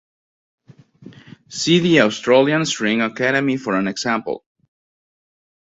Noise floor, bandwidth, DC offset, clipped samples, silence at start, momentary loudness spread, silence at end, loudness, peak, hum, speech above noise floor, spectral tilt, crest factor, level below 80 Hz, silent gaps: -44 dBFS; 8 kHz; under 0.1%; under 0.1%; 1.05 s; 9 LU; 1.4 s; -17 LUFS; 0 dBFS; none; 27 dB; -4.5 dB/octave; 20 dB; -62 dBFS; none